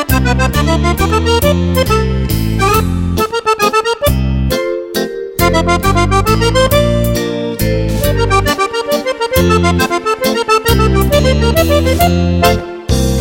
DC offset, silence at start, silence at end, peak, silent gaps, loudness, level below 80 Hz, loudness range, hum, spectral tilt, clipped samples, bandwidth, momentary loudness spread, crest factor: under 0.1%; 0 s; 0 s; 0 dBFS; none; -12 LUFS; -20 dBFS; 2 LU; none; -5.5 dB/octave; under 0.1%; 17 kHz; 5 LU; 12 dB